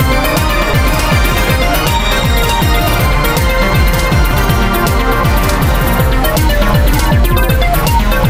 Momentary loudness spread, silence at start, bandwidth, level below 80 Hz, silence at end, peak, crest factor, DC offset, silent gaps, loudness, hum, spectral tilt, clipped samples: 1 LU; 0 s; 16.5 kHz; -14 dBFS; 0 s; 0 dBFS; 10 dB; under 0.1%; none; -12 LUFS; none; -5 dB/octave; under 0.1%